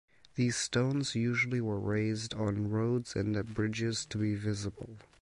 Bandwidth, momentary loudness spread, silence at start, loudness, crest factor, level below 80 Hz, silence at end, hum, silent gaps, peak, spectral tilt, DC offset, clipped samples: 11.5 kHz; 6 LU; 0.35 s; -33 LUFS; 14 dB; -58 dBFS; 0.2 s; none; none; -18 dBFS; -5 dB/octave; under 0.1%; under 0.1%